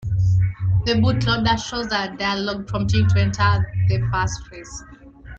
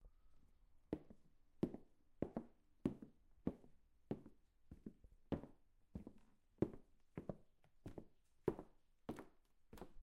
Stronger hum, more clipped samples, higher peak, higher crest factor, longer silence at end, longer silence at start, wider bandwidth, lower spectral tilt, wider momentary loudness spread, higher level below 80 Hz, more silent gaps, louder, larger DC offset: neither; neither; first, -4 dBFS vs -24 dBFS; second, 16 dB vs 28 dB; about the same, 0 s vs 0 s; about the same, 0 s vs 0 s; second, 7.6 kHz vs 13.5 kHz; second, -6 dB/octave vs -9 dB/octave; second, 10 LU vs 18 LU; first, -36 dBFS vs -68 dBFS; neither; first, -20 LUFS vs -51 LUFS; neither